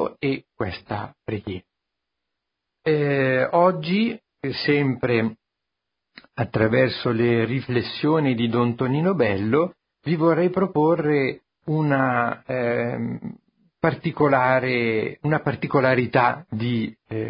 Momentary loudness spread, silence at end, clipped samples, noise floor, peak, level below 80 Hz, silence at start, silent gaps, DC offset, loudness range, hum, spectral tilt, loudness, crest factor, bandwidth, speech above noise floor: 11 LU; 0 s; under 0.1%; -83 dBFS; -4 dBFS; -54 dBFS; 0 s; none; under 0.1%; 3 LU; none; -11.5 dB/octave; -22 LUFS; 18 dB; 5.4 kHz; 61 dB